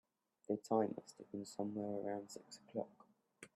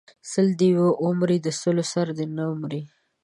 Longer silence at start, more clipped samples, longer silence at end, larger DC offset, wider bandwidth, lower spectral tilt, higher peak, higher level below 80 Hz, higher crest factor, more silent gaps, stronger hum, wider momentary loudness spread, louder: first, 0.5 s vs 0.25 s; neither; second, 0.1 s vs 0.4 s; neither; first, 13 kHz vs 11.5 kHz; about the same, -6 dB/octave vs -6.5 dB/octave; second, -24 dBFS vs -10 dBFS; second, -90 dBFS vs -70 dBFS; first, 22 dB vs 14 dB; neither; neither; first, 16 LU vs 10 LU; second, -44 LUFS vs -23 LUFS